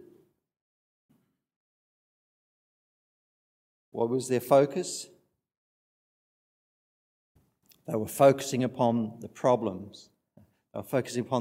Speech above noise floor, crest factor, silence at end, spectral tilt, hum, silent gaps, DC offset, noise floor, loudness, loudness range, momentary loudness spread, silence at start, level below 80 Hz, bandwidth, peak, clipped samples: 38 dB; 24 dB; 0 s; -5.5 dB/octave; none; 5.57-7.35 s; under 0.1%; -65 dBFS; -27 LUFS; 10 LU; 20 LU; 3.95 s; -78 dBFS; 16 kHz; -8 dBFS; under 0.1%